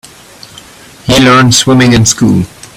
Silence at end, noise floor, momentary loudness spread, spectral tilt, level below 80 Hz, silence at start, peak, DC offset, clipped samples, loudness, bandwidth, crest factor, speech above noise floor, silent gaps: 0.3 s; -34 dBFS; 7 LU; -4 dB/octave; -32 dBFS; 1.05 s; 0 dBFS; under 0.1%; 0.4%; -6 LUFS; over 20 kHz; 8 dB; 28 dB; none